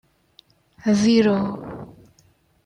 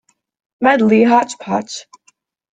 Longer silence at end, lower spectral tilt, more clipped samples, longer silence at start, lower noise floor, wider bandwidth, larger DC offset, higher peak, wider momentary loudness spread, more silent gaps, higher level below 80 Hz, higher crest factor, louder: about the same, 0.8 s vs 0.7 s; about the same, -6 dB/octave vs -5 dB/octave; neither; first, 0.85 s vs 0.6 s; about the same, -59 dBFS vs -58 dBFS; about the same, 10 kHz vs 9.2 kHz; neither; second, -6 dBFS vs -2 dBFS; first, 20 LU vs 15 LU; neither; about the same, -58 dBFS vs -60 dBFS; about the same, 18 dB vs 16 dB; second, -19 LUFS vs -14 LUFS